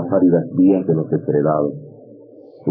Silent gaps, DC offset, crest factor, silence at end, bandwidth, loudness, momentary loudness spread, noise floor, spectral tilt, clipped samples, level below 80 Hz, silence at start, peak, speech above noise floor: none; under 0.1%; 12 dB; 0 s; 2.9 kHz; -17 LUFS; 10 LU; -42 dBFS; -12 dB/octave; under 0.1%; -62 dBFS; 0 s; -4 dBFS; 26 dB